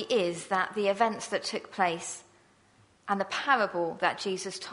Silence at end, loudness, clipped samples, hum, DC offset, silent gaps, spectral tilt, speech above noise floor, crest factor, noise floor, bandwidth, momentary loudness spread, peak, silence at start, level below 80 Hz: 0 s; -29 LUFS; under 0.1%; none; under 0.1%; none; -3 dB/octave; 33 dB; 20 dB; -63 dBFS; 11 kHz; 9 LU; -10 dBFS; 0 s; -78 dBFS